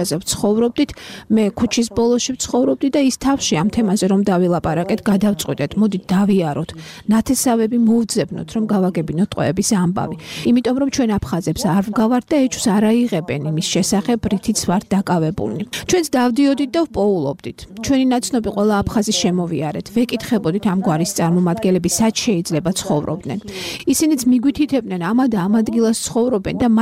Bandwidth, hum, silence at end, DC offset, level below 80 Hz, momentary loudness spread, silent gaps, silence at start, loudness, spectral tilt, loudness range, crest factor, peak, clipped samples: 16 kHz; none; 0 s; under 0.1%; -44 dBFS; 6 LU; none; 0 s; -18 LUFS; -5 dB/octave; 1 LU; 12 dB; -4 dBFS; under 0.1%